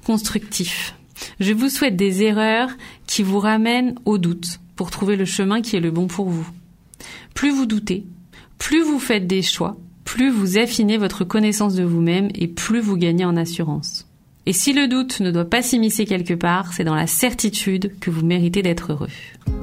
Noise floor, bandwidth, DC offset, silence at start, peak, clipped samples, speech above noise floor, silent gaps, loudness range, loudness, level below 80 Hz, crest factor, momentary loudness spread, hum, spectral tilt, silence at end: -43 dBFS; 16 kHz; under 0.1%; 0.05 s; -2 dBFS; under 0.1%; 24 dB; none; 3 LU; -20 LUFS; -44 dBFS; 16 dB; 11 LU; none; -4.5 dB/octave; 0 s